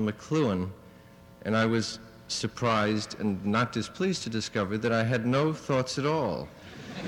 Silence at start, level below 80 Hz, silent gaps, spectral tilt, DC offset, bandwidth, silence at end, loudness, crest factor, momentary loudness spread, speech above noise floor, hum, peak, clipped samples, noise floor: 0 s; -60 dBFS; none; -5.5 dB/octave; under 0.1%; 15.5 kHz; 0 s; -29 LUFS; 16 dB; 11 LU; 24 dB; none; -12 dBFS; under 0.1%; -52 dBFS